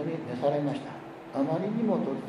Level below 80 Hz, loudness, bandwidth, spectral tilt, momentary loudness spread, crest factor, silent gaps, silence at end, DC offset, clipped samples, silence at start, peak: -72 dBFS; -30 LUFS; 11 kHz; -8.5 dB/octave; 10 LU; 16 dB; none; 0 s; under 0.1%; under 0.1%; 0 s; -14 dBFS